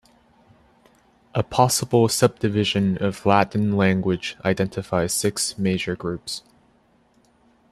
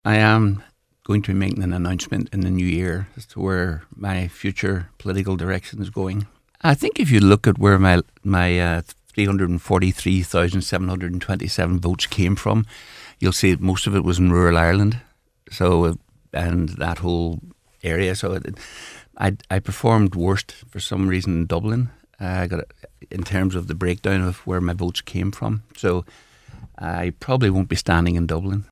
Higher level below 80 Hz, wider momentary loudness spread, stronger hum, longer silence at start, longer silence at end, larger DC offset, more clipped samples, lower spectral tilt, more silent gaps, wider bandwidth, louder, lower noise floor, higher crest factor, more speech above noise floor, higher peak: second, -54 dBFS vs -32 dBFS; second, 9 LU vs 14 LU; neither; first, 1.35 s vs 0.05 s; first, 1.3 s vs 0.05 s; neither; neither; second, -4.5 dB/octave vs -6 dB/octave; neither; about the same, 14.5 kHz vs 15 kHz; about the same, -22 LUFS vs -21 LUFS; first, -60 dBFS vs -43 dBFS; about the same, 22 dB vs 20 dB; first, 39 dB vs 23 dB; about the same, -2 dBFS vs 0 dBFS